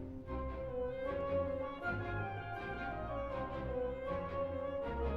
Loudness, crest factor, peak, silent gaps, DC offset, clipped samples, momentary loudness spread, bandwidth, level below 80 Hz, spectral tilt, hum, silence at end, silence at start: -40 LUFS; 14 dB; -26 dBFS; none; under 0.1%; under 0.1%; 5 LU; 6.2 kHz; -50 dBFS; -8.5 dB/octave; none; 0 s; 0 s